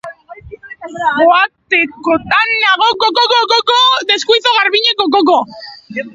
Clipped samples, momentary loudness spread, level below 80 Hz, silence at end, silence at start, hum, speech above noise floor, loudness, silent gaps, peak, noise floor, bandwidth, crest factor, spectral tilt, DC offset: under 0.1%; 15 LU; -52 dBFS; 0.05 s; 0.05 s; none; 22 dB; -11 LUFS; none; 0 dBFS; -34 dBFS; 8 kHz; 12 dB; -2 dB/octave; under 0.1%